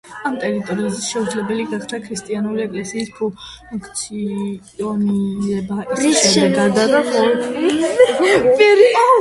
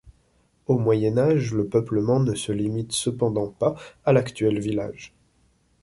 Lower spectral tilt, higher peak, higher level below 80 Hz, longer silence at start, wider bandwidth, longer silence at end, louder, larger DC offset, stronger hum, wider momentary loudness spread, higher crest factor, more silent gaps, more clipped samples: second, -4 dB/octave vs -6.5 dB/octave; first, 0 dBFS vs -6 dBFS; about the same, -54 dBFS vs -54 dBFS; about the same, 0.05 s vs 0.05 s; about the same, 11.5 kHz vs 11.5 kHz; second, 0 s vs 0.75 s; first, -17 LUFS vs -23 LUFS; neither; neither; first, 14 LU vs 7 LU; about the same, 16 dB vs 16 dB; neither; neither